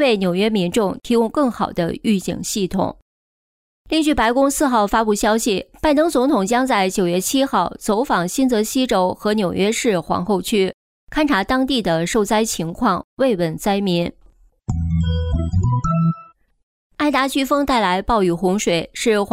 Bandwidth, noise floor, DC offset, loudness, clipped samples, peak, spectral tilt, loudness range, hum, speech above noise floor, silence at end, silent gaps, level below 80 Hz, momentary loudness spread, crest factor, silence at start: 16 kHz; -51 dBFS; under 0.1%; -19 LUFS; under 0.1%; -6 dBFS; -5 dB/octave; 4 LU; none; 33 dB; 0 s; 3.02-3.85 s, 10.74-11.07 s, 13.04-13.17 s, 16.63-16.90 s; -38 dBFS; 5 LU; 12 dB; 0 s